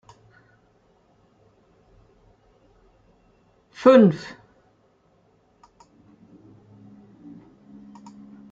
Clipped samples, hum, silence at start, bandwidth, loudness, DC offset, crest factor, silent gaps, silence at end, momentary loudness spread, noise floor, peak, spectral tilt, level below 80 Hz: under 0.1%; none; 3.8 s; 7.6 kHz; -17 LUFS; under 0.1%; 26 dB; none; 4.35 s; 32 LU; -62 dBFS; -2 dBFS; -8 dB/octave; -66 dBFS